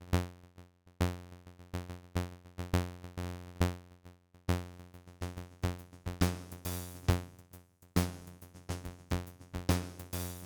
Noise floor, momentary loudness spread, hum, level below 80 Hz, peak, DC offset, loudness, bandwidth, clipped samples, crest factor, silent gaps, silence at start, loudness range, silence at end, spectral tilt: -59 dBFS; 19 LU; none; -48 dBFS; -16 dBFS; under 0.1%; -38 LUFS; over 20 kHz; under 0.1%; 22 dB; none; 0 s; 3 LU; 0 s; -5.5 dB/octave